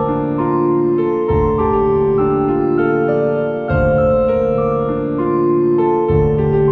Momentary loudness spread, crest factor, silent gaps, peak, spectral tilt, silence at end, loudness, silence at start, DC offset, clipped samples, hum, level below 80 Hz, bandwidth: 3 LU; 12 dB; none; -4 dBFS; -11 dB/octave; 0 s; -15 LUFS; 0 s; under 0.1%; under 0.1%; none; -30 dBFS; 4.5 kHz